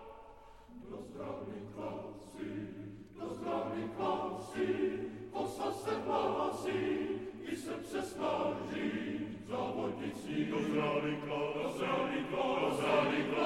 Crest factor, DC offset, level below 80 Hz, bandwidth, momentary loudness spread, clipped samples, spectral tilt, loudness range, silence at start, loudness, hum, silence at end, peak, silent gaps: 18 dB; under 0.1%; -66 dBFS; 16 kHz; 13 LU; under 0.1%; -5.5 dB/octave; 7 LU; 0 s; -37 LUFS; none; 0 s; -18 dBFS; none